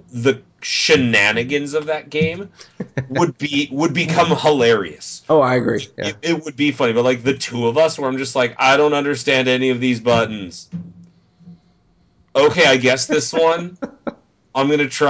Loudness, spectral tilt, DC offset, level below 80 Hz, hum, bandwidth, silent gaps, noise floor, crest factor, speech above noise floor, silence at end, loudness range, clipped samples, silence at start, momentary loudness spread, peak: -17 LUFS; -4.5 dB/octave; under 0.1%; -54 dBFS; none; 8 kHz; none; -57 dBFS; 16 dB; 40 dB; 0 s; 3 LU; under 0.1%; 0.15 s; 16 LU; -2 dBFS